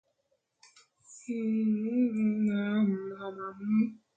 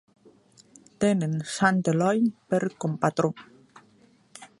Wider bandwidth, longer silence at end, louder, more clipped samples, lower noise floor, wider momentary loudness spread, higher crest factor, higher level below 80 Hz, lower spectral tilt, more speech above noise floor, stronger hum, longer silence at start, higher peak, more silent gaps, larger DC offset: second, 8 kHz vs 11.5 kHz; about the same, 0.2 s vs 0.15 s; second, -30 LUFS vs -25 LUFS; neither; first, -77 dBFS vs -59 dBFS; about the same, 11 LU vs 10 LU; second, 12 dB vs 20 dB; second, -76 dBFS vs -66 dBFS; first, -7.5 dB/octave vs -6 dB/octave; first, 49 dB vs 35 dB; neither; about the same, 1.1 s vs 1 s; second, -18 dBFS vs -6 dBFS; neither; neither